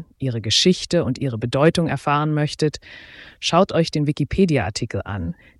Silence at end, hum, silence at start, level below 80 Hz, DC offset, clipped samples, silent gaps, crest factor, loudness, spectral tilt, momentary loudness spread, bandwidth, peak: 0.25 s; none; 0 s; -44 dBFS; under 0.1%; under 0.1%; none; 18 dB; -20 LUFS; -5 dB/octave; 10 LU; 12 kHz; -4 dBFS